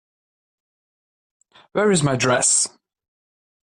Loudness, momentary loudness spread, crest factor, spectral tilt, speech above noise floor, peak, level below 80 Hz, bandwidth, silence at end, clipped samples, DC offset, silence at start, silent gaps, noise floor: -18 LUFS; 9 LU; 18 dB; -3.5 dB/octave; over 71 dB; -6 dBFS; -60 dBFS; 14 kHz; 0.95 s; under 0.1%; under 0.1%; 1.75 s; none; under -90 dBFS